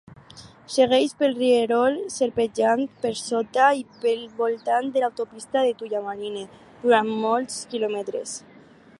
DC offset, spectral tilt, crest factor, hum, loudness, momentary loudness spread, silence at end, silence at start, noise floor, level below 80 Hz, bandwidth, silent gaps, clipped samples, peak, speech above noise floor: under 0.1%; -3.5 dB/octave; 18 dB; none; -23 LUFS; 12 LU; 0.6 s; 0.35 s; -47 dBFS; -66 dBFS; 11.5 kHz; none; under 0.1%; -6 dBFS; 24 dB